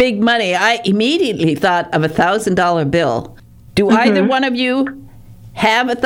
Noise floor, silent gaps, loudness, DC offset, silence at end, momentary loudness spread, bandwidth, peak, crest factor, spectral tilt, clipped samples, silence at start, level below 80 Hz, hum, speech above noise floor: -37 dBFS; none; -15 LUFS; under 0.1%; 0 s; 6 LU; 16.5 kHz; -2 dBFS; 14 dB; -5 dB/octave; under 0.1%; 0 s; -46 dBFS; none; 23 dB